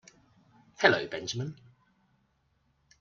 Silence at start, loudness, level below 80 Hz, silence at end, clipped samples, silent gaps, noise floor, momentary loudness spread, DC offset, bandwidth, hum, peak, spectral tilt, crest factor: 0.8 s; -29 LUFS; -72 dBFS; 1.45 s; under 0.1%; none; -72 dBFS; 13 LU; under 0.1%; 7.6 kHz; none; -6 dBFS; -4 dB/octave; 28 dB